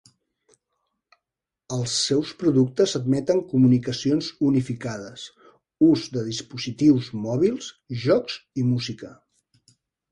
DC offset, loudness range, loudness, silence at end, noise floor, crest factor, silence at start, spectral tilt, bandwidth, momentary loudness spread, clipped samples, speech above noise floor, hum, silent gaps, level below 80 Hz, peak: under 0.1%; 3 LU; -23 LUFS; 1 s; -87 dBFS; 16 dB; 1.7 s; -6 dB/octave; 11 kHz; 14 LU; under 0.1%; 65 dB; none; none; -60 dBFS; -8 dBFS